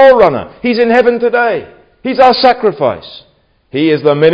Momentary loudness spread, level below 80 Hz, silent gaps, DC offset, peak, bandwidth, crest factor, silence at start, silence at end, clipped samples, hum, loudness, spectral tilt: 14 LU; -46 dBFS; none; under 0.1%; 0 dBFS; 7.2 kHz; 10 dB; 0 s; 0 s; 0.9%; none; -11 LUFS; -7 dB/octave